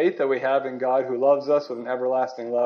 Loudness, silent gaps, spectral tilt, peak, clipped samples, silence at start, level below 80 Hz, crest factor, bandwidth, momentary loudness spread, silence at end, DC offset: -23 LUFS; none; -6.5 dB/octave; -8 dBFS; under 0.1%; 0 s; -84 dBFS; 14 dB; 6.6 kHz; 5 LU; 0 s; under 0.1%